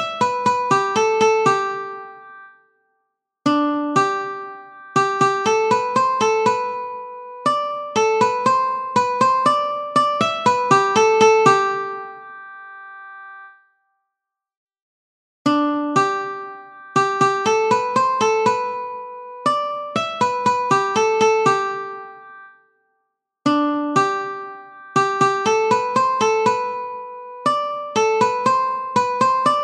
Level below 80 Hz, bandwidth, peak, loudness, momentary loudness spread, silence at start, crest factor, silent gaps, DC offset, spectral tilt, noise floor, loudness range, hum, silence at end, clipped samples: -66 dBFS; 11.5 kHz; 0 dBFS; -19 LUFS; 18 LU; 0 s; 18 dB; 14.57-14.67 s, 14.82-15.45 s; under 0.1%; -4 dB/octave; -83 dBFS; 7 LU; none; 0 s; under 0.1%